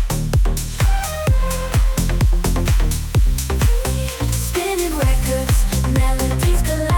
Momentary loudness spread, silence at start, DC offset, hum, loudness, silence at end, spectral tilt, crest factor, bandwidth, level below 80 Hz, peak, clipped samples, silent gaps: 2 LU; 0 s; under 0.1%; none; -19 LUFS; 0 s; -5 dB/octave; 10 dB; 19.5 kHz; -18 dBFS; -6 dBFS; under 0.1%; none